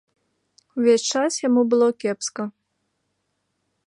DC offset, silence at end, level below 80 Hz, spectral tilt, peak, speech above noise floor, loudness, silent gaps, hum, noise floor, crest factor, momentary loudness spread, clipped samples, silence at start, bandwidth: under 0.1%; 1.35 s; -78 dBFS; -3.5 dB/octave; -6 dBFS; 54 dB; -20 LUFS; none; none; -74 dBFS; 16 dB; 14 LU; under 0.1%; 0.75 s; 11 kHz